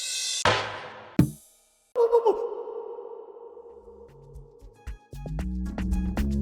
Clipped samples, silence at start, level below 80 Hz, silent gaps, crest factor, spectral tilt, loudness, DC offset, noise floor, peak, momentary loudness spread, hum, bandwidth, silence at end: under 0.1%; 0 s; -38 dBFS; none; 22 dB; -4.5 dB/octave; -27 LUFS; under 0.1%; -61 dBFS; -6 dBFS; 25 LU; none; 19.5 kHz; 0 s